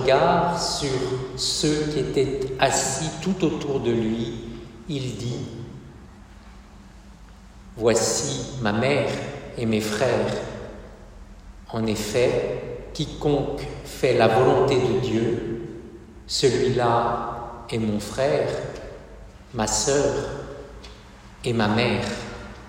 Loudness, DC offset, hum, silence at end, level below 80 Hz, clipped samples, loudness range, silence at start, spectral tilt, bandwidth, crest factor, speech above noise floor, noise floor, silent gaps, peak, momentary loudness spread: -23 LUFS; under 0.1%; none; 0 s; -44 dBFS; under 0.1%; 6 LU; 0 s; -4.5 dB/octave; 16 kHz; 20 dB; 23 dB; -45 dBFS; none; -4 dBFS; 18 LU